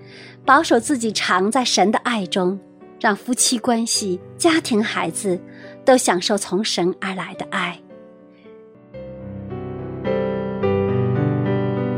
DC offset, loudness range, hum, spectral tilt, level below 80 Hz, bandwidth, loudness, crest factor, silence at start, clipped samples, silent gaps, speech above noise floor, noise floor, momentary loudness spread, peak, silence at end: under 0.1%; 9 LU; none; -4 dB/octave; -54 dBFS; 16 kHz; -19 LUFS; 20 dB; 0 s; under 0.1%; none; 25 dB; -44 dBFS; 15 LU; 0 dBFS; 0 s